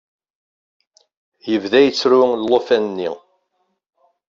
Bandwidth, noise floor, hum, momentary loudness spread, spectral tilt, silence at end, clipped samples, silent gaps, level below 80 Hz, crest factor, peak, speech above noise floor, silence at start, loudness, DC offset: 7.6 kHz; -69 dBFS; none; 13 LU; -4.5 dB/octave; 1.1 s; under 0.1%; none; -64 dBFS; 18 dB; 0 dBFS; 54 dB; 1.45 s; -16 LUFS; under 0.1%